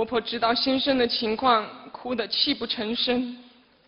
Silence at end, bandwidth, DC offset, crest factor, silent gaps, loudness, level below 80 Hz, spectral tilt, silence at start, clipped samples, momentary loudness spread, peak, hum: 0.4 s; 5.8 kHz; under 0.1%; 18 dB; none; -24 LUFS; -58 dBFS; -6.5 dB/octave; 0 s; under 0.1%; 12 LU; -6 dBFS; none